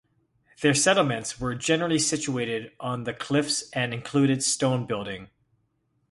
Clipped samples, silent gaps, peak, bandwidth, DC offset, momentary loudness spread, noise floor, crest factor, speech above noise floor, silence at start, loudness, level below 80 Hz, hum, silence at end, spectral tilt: under 0.1%; none; -6 dBFS; 11.5 kHz; under 0.1%; 11 LU; -72 dBFS; 20 dB; 46 dB; 0.6 s; -25 LUFS; -58 dBFS; none; 0.85 s; -4 dB/octave